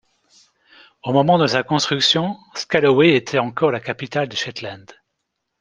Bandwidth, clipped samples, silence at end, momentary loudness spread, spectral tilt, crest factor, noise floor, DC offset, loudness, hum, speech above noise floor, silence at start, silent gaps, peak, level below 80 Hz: 10 kHz; under 0.1%; 0.8 s; 13 LU; -4.5 dB/octave; 18 dB; -76 dBFS; under 0.1%; -18 LUFS; none; 58 dB; 1.05 s; none; -2 dBFS; -60 dBFS